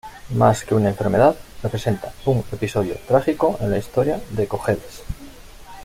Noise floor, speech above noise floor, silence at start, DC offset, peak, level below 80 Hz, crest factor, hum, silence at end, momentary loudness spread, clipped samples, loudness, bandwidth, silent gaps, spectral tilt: -40 dBFS; 20 dB; 0.05 s; under 0.1%; -2 dBFS; -42 dBFS; 18 dB; none; 0 s; 11 LU; under 0.1%; -21 LUFS; 16 kHz; none; -7 dB/octave